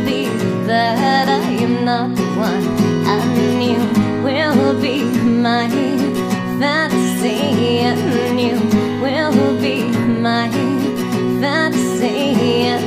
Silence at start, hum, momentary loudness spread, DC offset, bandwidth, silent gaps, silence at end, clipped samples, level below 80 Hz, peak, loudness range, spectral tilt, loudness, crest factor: 0 s; none; 3 LU; under 0.1%; 15.5 kHz; none; 0 s; under 0.1%; -50 dBFS; 0 dBFS; 1 LU; -5.5 dB/octave; -16 LUFS; 14 dB